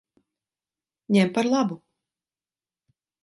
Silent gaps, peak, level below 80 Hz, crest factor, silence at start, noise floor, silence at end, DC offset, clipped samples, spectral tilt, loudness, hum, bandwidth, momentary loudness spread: none; -8 dBFS; -74 dBFS; 20 dB; 1.1 s; under -90 dBFS; 1.45 s; under 0.1%; under 0.1%; -6 dB/octave; -23 LUFS; none; 11.5 kHz; 9 LU